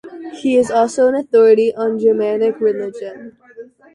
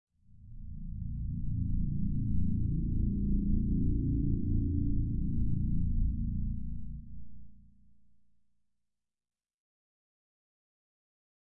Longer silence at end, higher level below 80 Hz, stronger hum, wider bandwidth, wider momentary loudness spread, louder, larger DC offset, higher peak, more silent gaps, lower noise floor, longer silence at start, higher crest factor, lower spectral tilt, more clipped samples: second, 0.3 s vs 3 s; second, -62 dBFS vs -36 dBFS; neither; first, 11 kHz vs 0.6 kHz; about the same, 15 LU vs 13 LU; first, -15 LUFS vs -34 LUFS; neither; first, -2 dBFS vs -18 dBFS; neither; second, -39 dBFS vs -87 dBFS; second, 0.05 s vs 0.45 s; about the same, 14 dB vs 14 dB; second, -5.5 dB/octave vs -15 dB/octave; neither